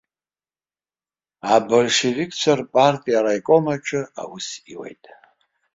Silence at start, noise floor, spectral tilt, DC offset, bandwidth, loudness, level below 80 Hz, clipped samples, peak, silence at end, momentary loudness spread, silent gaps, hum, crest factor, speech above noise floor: 1.45 s; under -90 dBFS; -4 dB/octave; under 0.1%; 8 kHz; -19 LUFS; -64 dBFS; under 0.1%; -2 dBFS; 0.8 s; 16 LU; none; none; 20 dB; over 70 dB